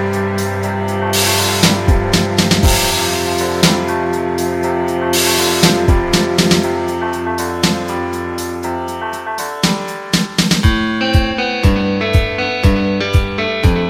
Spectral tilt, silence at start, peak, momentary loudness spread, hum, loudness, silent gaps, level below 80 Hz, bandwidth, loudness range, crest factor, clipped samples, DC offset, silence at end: -4.5 dB/octave; 0 s; 0 dBFS; 9 LU; none; -15 LUFS; none; -24 dBFS; 17 kHz; 4 LU; 14 dB; under 0.1%; under 0.1%; 0 s